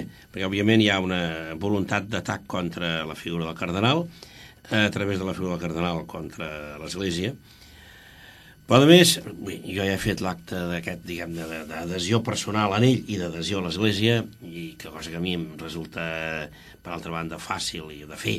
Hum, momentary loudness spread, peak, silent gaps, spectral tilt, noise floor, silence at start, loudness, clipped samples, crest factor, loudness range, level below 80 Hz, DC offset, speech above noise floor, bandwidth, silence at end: none; 17 LU; -2 dBFS; none; -5 dB/octave; -49 dBFS; 0 s; -25 LUFS; under 0.1%; 24 dB; 9 LU; -52 dBFS; under 0.1%; 24 dB; 15.5 kHz; 0 s